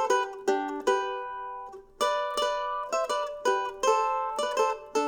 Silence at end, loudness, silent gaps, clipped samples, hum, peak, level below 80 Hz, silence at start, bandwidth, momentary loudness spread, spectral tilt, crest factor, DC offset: 0 s; -28 LUFS; none; under 0.1%; none; -12 dBFS; -62 dBFS; 0 s; over 20 kHz; 10 LU; -1 dB/octave; 16 dB; under 0.1%